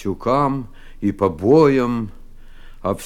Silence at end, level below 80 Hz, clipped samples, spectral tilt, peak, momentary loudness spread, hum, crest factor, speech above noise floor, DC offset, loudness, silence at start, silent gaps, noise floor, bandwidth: 0 s; -40 dBFS; under 0.1%; -7.5 dB/octave; -4 dBFS; 15 LU; none; 16 dB; 19 dB; under 0.1%; -18 LUFS; 0 s; none; -37 dBFS; 13 kHz